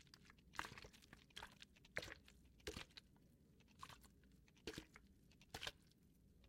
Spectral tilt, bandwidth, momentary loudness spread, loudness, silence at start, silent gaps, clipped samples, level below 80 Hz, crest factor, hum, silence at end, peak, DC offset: -3 dB/octave; 16 kHz; 14 LU; -56 LUFS; 0 s; none; under 0.1%; -72 dBFS; 32 dB; none; 0 s; -28 dBFS; under 0.1%